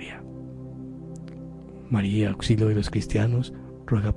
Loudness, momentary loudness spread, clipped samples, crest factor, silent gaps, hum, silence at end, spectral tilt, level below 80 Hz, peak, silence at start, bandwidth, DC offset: -25 LUFS; 17 LU; under 0.1%; 16 dB; none; none; 0 s; -7 dB/octave; -42 dBFS; -10 dBFS; 0 s; 11 kHz; under 0.1%